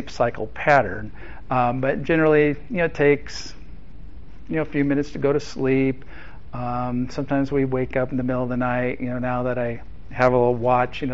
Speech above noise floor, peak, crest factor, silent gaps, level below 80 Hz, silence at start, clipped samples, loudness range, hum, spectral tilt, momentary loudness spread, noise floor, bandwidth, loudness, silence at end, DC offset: 19 dB; -2 dBFS; 20 dB; none; -42 dBFS; 0 s; under 0.1%; 4 LU; none; -6 dB/octave; 16 LU; -41 dBFS; 7.6 kHz; -22 LUFS; 0 s; 2%